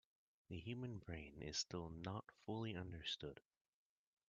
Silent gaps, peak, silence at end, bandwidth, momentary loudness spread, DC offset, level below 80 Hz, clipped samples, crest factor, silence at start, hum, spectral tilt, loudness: none; -32 dBFS; 0.9 s; 8.4 kHz; 8 LU; under 0.1%; -70 dBFS; under 0.1%; 20 dB; 0.5 s; none; -4 dB/octave; -49 LUFS